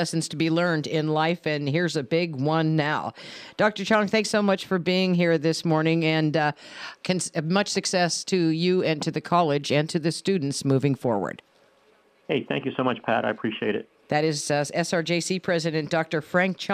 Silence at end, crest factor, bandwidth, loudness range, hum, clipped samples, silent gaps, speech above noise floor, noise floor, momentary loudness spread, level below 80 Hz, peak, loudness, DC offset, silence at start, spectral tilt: 0 s; 16 dB; 14.5 kHz; 4 LU; none; under 0.1%; none; 36 dB; -61 dBFS; 6 LU; -70 dBFS; -8 dBFS; -24 LUFS; under 0.1%; 0 s; -5 dB/octave